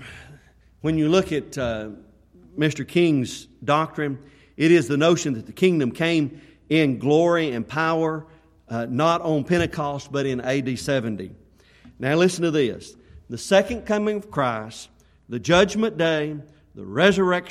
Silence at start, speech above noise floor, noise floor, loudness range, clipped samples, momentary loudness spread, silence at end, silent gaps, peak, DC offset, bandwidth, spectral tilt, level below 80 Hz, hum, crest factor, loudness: 0 s; 31 dB; -52 dBFS; 3 LU; under 0.1%; 14 LU; 0 s; none; -4 dBFS; under 0.1%; 13.5 kHz; -5.5 dB/octave; -52 dBFS; none; 20 dB; -22 LUFS